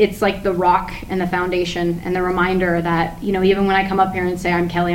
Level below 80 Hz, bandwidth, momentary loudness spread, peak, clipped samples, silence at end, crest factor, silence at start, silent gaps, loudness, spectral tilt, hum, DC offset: -36 dBFS; 16.5 kHz; 5 LU; -4 dBFS; under 0.1%; 0 s; 14 dB; 0 s; none; -18 LUFS; -6.5 dB/octave; none; under 0.1%